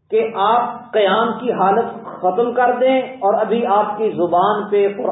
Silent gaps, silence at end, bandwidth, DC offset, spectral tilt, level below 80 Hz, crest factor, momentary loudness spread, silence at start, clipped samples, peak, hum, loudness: none; 0 s; 4 kHz; under 0.1%; -10.5 dB/octave; -66 dBFS; 14 dB; 4 LU; 0.1 s; under 0.1%; -4 dBFS; none; -17 LUFS